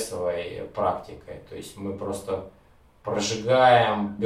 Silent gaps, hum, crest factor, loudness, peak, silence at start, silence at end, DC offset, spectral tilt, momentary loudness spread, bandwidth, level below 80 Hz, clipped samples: none; none; 20 dB; -24 LUFS; -6 dBFS; 0 s; 0 s; under 0.1%; -4.5 dB/octave; 22 LU; 15 kHz; -56 dBFS; under 0.1%